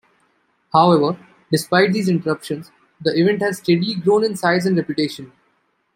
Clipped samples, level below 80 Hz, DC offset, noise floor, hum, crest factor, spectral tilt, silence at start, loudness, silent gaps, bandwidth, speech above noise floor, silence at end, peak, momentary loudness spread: under 0.1%; -64 dBFS; under 0.1%; -65 dBFS; none; 18 dB; -6 dB/octave; 0.75 s; -18 LUFS; none; 16.5 kHz; 47 dB; 0.7 s; -2 dBFS; 10 LU